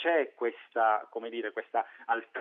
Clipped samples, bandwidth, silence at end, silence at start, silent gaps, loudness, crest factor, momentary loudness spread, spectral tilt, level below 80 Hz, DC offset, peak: under 0.1%; 3.9 kHz; 0 s; 0 s; none; -32 LUFS; 18 dB; 8 LU; 0.5 dB/octave; under -90 dBFS; under 0.1%; -14 dBFS